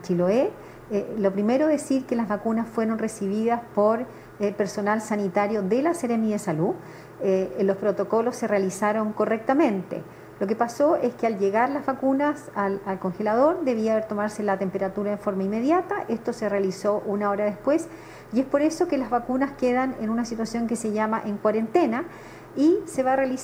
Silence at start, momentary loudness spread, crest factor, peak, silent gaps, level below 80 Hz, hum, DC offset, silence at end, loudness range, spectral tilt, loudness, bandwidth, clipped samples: 0 s; 7 LU; 16 dB; -8 dBFS; none; -58 dBFS; none; under 0.1%; 0 s; 1 LU; -6.5 dB/octave; -25 LUFS; 15.5 kHz; under 0.1%